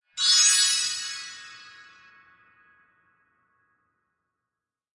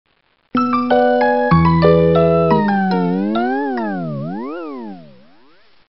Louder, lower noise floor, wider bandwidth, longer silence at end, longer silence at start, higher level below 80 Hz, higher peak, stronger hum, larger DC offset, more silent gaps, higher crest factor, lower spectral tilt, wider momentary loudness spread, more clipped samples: second, -19 LUFS vs -15 LUFS; first, -88 dBFS vs -52 dBFS; first, 11.5 kHz vs 5.8 kHz; first, 3.3 s vs 0.9 s; second, 0.15 s vs 0.55 s; second, -82 dBFS vs -40 dBFS; second, -8 dBFS vs -2 dBFS; neither; second, under 0.1% vs 0.8%; neither; first, 22 dB vs 14 dB; second, 5 dB/octave vs -10.5 dB/octave; first, 25 LU vs 14 LU; neither